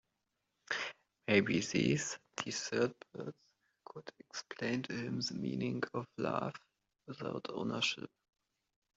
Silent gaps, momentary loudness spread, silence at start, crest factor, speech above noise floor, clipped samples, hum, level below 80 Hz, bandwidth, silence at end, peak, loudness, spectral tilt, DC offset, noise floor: none; 16 LU; 0.7 s; 24 dB; 48 dB; under 0.1%; none; -74 dBFS; 8.2 kHz; 0.9 s; -16 dBFS; -37 LUFS; -4.5 dB/octave; under 0.1%; -85 dBFS